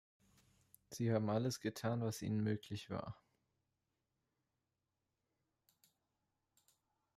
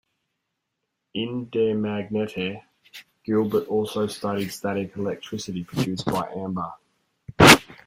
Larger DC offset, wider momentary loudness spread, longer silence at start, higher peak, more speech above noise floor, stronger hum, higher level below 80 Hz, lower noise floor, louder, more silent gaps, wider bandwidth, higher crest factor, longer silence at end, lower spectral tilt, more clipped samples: neither; second, 13 LU vs 17 LU; second, 0.9 s vs 1.15 s; second, -26 dBFS vs 0 dBFS; second, 49 dB vs 54 dB; neither; second, -78 dBFS vs -52 dBFS; first, -89 dBFS vs -80 dBFS; second, -41 LUFS vs -23 LUFS; neither; about the same, 15 kHz vs 16 kHz; about the same, 20 dB vs 24 dB; first, 4.05 s vs 0.15 s; first, -6.5 dB/octave vs -4 dB/octave; neither